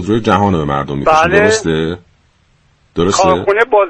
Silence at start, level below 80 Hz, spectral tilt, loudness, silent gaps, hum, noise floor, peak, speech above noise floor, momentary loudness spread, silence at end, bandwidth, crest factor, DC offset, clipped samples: 0 s; -38 dBFS; -5 dB/octave; -12 LUFS; none; none; -53 dBFS; 0 dBFS; 42 dB; 9 LU; 0 s; 10 kHz; 12 dB; under 0.1%; under 0.1%